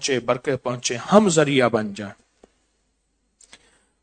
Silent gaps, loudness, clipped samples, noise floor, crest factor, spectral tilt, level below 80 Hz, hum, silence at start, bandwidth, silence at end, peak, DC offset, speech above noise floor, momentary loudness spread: none; -20 LUFS; under 0.1%; -70 dBFS; 22 dB; -4.5 dB/octave; -62 dBFS; none; 0 s; 9.4 kHz; 1.9 s; 0 dBFS; under 0.1%; 50 dB; 15 LU